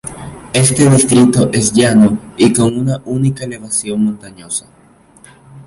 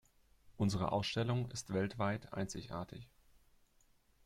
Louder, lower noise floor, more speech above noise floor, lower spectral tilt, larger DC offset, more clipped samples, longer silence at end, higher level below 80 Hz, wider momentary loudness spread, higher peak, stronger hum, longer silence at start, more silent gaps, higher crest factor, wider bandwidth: first, -12 LUFS vs -39 LUFS; second, -44 dBFS vs -71 dBFS; about the same, 32 dB vs 33 dB; about the same, -5 dB/octave vs -5.5 dB/octave; neither; neither; second, 0.05 s vs 1.2 s; first, -42 dBFS vs -64 dBFS; first, 13 LU vs 10 LU; first, 0 dBFS vs -22 dBFS; neither; second, 0.05 s vs 0.45 s; neither; about the same, 14 dB vs 18 dB; second, 11.5 kHz vs 14.5 kHz